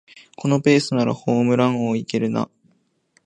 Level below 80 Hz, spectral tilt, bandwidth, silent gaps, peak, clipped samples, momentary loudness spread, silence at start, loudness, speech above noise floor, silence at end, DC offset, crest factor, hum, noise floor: -64 dBFS; -6.5 dB/octave; 10 kHz; none; -2 dBFS; under 0.1%; 9 LU; 0.4 s; -20 LUFS; 44 dB; 0.8 s; under 0.1%; 18 dB; none; -63 dBFS